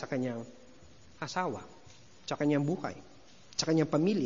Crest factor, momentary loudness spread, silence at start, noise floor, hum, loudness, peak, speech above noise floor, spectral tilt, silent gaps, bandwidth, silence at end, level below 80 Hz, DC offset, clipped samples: 18 dB; 18 LU; 0 s; -57 dBFS; none; -33 LUFS; -14 dBFS; 26 dB; -5.5 dB/octave; none; 7.6 kHz; 0 s; -70 dBFS; 0.2%; under 0.1%